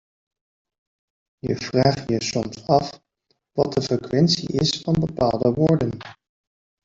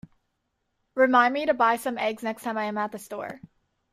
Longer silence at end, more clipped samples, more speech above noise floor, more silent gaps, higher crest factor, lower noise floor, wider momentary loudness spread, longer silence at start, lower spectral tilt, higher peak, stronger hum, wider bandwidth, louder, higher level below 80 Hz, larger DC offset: first, 0.7 s vs 0.55 s; neither; about the same, 50 dB vs 52 dB; neither; about the same, 20 dB vs 20 dB; second, -71 dBFS vs -77 dBFS; second, 10 LU vs 16 LU; first, 1.45 s vs 0.95 s; first, -6 dB/octave vs -4 dB/octave; first, -4 dBFS vs -8 dBFS; neither; second, 7.8 kHz vs 15.5 kHz; about the same, -22 LUFS vs -24 LUFS; first, -50 dBFS vs -70 dBFS; neither